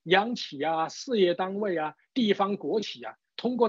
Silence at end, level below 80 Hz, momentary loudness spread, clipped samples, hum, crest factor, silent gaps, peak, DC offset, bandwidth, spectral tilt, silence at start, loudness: 0 s; -82 dBFS; 9 LU; under 0.1%; none; 18 dB; none; -8 dBFS; under 0.1%; 7.6 kHz; -5 dB/octave; 0.05 s; -28 LUFS